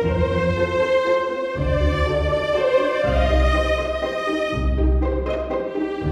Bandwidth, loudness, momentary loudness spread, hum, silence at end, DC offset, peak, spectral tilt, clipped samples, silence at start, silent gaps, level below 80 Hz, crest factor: 9.2 kHz; -21 LUFS; 6 LU; none; 0 s; under 0.1%; -6 dBFS; -7 dB/octave; under 0.1%; 0 s; none; -26 dBFS; 12 dB